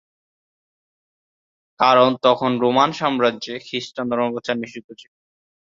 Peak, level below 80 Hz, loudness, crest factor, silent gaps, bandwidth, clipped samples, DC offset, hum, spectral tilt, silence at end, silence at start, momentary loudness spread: -2 dBFS; -64 dBFS; -19 LUFS; 20 dB; 4.84-4.89 s; 7.6 kHz; under 0.1%; under 0.1%; none; -5 dB/octave; 0.65 s; 1.8 s; 13 LU